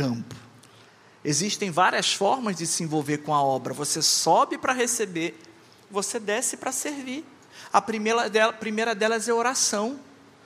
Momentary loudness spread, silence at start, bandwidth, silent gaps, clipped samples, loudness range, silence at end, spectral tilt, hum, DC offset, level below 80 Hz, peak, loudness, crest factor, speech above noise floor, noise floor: 12 LU; 0 s; 15.5 kHz; none; under 0.1%; 5 LU; 0.4 s; -2.5 dB/octave; none; under 0.1%; -74 dBFS; -4 dBFS; -24 LUFS; 22 dB; 28 dB; -53 dBFS